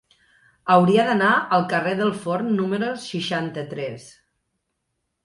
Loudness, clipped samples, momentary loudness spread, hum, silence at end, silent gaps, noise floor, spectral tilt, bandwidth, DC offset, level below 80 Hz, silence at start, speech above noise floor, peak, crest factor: -21 LUFS; under 0.1%; 13 LU; none; 1.15 s; none; -77 dBFS; -6 dB/octave; 11.5 kHz; under 0.1%; -66 dBFS; 0.65 s; 56 dB; -2 dBFS; 20 dB